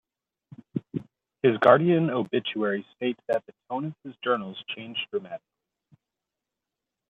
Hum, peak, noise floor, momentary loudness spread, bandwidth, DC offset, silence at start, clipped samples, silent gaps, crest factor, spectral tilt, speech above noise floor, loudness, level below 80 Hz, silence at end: none; -4 dBFS; -87 dBFS; 17 LU; 5.4 kHz; under 0.1%; 0.75 s; under 0.1%; none; 24 dB; -8 dB/octave; 61 dB; -26 LUFS; -74 dBFS; 1.75 s